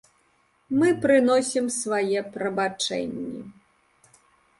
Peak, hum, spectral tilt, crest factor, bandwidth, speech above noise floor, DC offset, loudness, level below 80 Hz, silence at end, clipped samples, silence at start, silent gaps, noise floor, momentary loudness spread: -8 dBFS; none; -4 dB/octave; 18 dB; 11.5 kHz; 42 dB; under 0.1%; -24 LUFS; -66 dBFS; 1.1 s; under 0.1%; 0.7 s; none; -65 dBFS; 13 LU